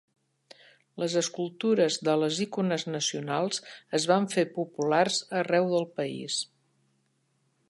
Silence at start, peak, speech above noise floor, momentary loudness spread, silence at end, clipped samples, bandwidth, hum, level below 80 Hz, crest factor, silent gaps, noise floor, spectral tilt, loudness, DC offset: 0.95 s; -10 dBFS; 45 dB; 7 LU; 1.25 s; under 0.1%; 11.5 kHz; none; -80 dBFS; 20 dB; none; -72 dBFS; -4 dB/octave; -28 LUFS; under 0.1%